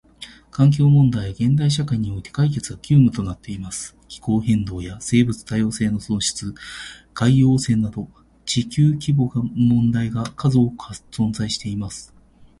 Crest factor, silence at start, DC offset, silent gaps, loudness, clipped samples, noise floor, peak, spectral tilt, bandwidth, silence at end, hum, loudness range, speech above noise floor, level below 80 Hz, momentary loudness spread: 16 dB; 0.2 s; under 0.1%; none; -20 LUFS; under 0.1%; -43 dBFS; -4 dBFS; -6 dB/octave; 11.5 kHz; 0.55 s; none; 4 LU; 23 dB; -44 dBFS; 17 LU